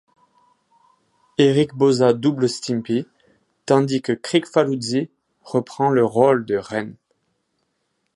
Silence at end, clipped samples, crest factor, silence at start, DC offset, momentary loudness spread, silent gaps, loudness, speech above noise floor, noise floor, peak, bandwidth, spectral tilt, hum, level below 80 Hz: 1.25 s; under 0.1%; 20 dB; 1.4 s; under 0.1%; 12 LU; none; -20 LUFS; 53 dB; -72 dBFS; -2 dBFS; 11.5 kHz; -6 dB/octave; none; -64 dBFS